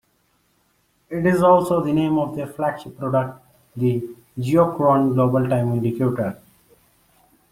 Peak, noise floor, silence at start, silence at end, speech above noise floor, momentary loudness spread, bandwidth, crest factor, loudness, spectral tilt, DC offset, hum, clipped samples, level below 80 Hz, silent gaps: -2 dBFS; -65 dBFS; 1.1 s; 1.15 s; 45 dB; 13 LU; 16 kHz; 18 dB; -20 LUFS; -8.5 dB/octave; under 0.1%; none; under 0.1%; -54 dBFS; none